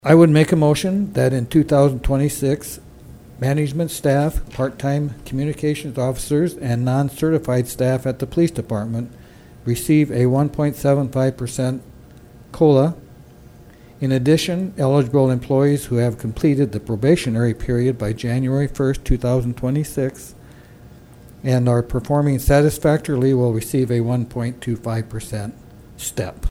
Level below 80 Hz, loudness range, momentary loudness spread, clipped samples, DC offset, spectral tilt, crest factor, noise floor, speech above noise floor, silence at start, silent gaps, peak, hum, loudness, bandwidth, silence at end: -36 dBFS; 4 LU; 10 LU; under 0.1%; under 0.1%; -7 dB/octave; 18 dB; -44 dBFS; 26 dB; 0.05 s; none; 0 dBFS; none; -19 LUFS; 16.5 kHz; 0 s